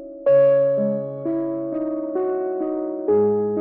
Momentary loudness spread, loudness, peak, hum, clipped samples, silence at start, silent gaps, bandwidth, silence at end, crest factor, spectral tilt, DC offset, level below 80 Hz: 10 LU; -21 LUFS; -8 dBFS; none; under 0.1%; 0 s; none; 3 kHz; 0 s; 12 dB; -12 dB/octave; under 0.1%; -66 dBFS